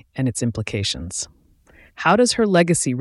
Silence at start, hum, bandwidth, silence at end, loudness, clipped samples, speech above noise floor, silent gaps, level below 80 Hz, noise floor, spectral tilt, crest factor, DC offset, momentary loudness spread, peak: 0.15 s; none; 12 kHz; 0 s; -20 LUFS; under 0.1%; 33 dB; none; -48 dBFS; -52 dBFS; -4.5 dB/octave; 16 dB; under 0.1%; 12 LU; -4 dBFS